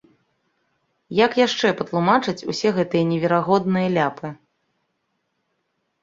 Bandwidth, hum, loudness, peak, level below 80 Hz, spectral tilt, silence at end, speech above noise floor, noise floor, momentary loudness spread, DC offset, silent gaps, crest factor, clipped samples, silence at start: 7.6 kHz; none; -20 LUFS; -2 dBFS; -62 dBFS; -6 dB/octave; 1.7 s; 53 dB; -73 dBFS; 7 LU; under 0.1%; none; 20 dB; under 0.1%; 1.1 s